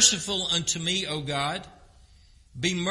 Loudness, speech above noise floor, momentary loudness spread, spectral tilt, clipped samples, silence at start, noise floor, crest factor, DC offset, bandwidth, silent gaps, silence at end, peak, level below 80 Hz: -26 LUFS; 29 dB; 6 LU; -2 dB/octave; under 0.1%; 0 s; -55 dBFS; 24 dB; under 0.1%; 11.5 kHz; none; 0 s; -4 dBFS; -54 dBFS